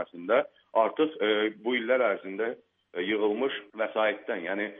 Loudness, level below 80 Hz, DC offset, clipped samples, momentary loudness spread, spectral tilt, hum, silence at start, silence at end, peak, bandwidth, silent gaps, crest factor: -28 LUFS; -82 dBFS; under 0.1%; under 0.1%; 8 LU; -1.5 dB/octave; none; 0 s; 0 s; -10 dBFS; 3.9 kHz; none; 18 dB